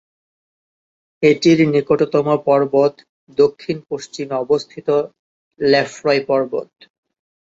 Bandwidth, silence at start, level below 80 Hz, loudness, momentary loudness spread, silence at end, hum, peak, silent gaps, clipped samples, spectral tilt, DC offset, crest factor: 7.8 kHz; 1.2 s; -60 dBFS; -17 LUFS; 12 LU; 0.95 s; none; -2 dBFS; 3.09-3.27 s, 5.19-5.51 s; under 0.1%; -6 dB/octave; under 0.1%; 16 dB